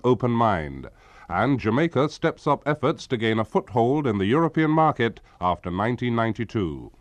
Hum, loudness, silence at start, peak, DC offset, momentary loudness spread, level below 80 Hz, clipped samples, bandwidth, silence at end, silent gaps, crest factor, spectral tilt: none; -23 LUFS; 0.05 s; -8 dBFS; under 0.1%; 7 LU; -50 dBFS; under 0.1%; 9.4 kHz; 0.1 s; none; 16 dB; -7.5 dB/octave